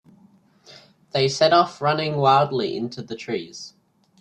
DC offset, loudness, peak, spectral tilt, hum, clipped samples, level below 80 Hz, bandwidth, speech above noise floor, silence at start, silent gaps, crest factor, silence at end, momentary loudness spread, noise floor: under 0.1%; -21 LUFS; -4 dBFS; -5 dB/octave; none; under 0.1%; -64 dBFS; 9.8 kHz; 35 dB; 1.15 s; none; 20 dB; 0.5 s; 17 LU; -56 dBFS